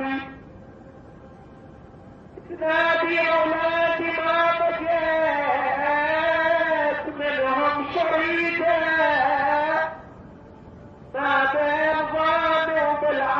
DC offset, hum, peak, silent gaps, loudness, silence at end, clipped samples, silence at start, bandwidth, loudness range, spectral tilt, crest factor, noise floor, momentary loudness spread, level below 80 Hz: under 0.1%; none; -10 dBFS; none; -22 LUFS; 0 s; under 0.1%; 0 s; 6.6 kHz; 2 LU; -5.5 dB/octave; 14 dB; -45 dBFS; 6 LU; -54 dBFS